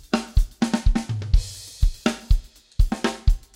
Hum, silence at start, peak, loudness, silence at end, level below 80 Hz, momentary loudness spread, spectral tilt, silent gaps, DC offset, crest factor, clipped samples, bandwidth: none; 0.15 s; -4 dBFS; -25 LUFS; 0.2 s; -22 dBFS; 4 LU; -5.5 dB/octave; none; under 0.1%; 16 dB; under 0.1%; 13 kHz